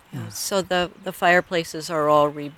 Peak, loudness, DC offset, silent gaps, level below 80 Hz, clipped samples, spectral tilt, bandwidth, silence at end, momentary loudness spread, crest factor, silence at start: -4 dBFS; -22 LUFS; under 0.1%; none; -56 dBFS; under 0.1%; -4 dB/octave; 18 kHz; 0.05 s; 10 LU; 18 dB; 0.1 s